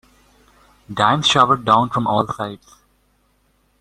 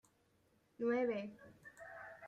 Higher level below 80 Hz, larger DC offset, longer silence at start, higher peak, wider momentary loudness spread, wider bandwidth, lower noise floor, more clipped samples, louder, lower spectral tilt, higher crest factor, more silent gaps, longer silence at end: first, -54 dBFS vs -82 dBFS; neither; about the same, 0.9 s vs 0.8 s; first, 0 dBFS vs -26 dBFS; second, 14 LU vs 21 LU; first, 14.5 kHz vs 9.2 kHz; second, -61 dBFS vs -75 dBFS; neither; first, -17 LUFS vs -39 LUFS; second, -4.5 dB/octave vs -6.5 dB/octave; about the same, 20 dB vs 18 dB; neither; first, 1.25 s vs 0 s